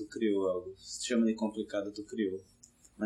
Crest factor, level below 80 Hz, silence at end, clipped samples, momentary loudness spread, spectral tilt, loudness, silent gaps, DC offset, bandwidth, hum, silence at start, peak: 16 dB; -70 dBFS; 0 s; under 0.1%; 10 LU; -4.5 dB/octave; -34 LUFS; none; under 0.1%; 12 kHz; none; 0 s; -18 dBFS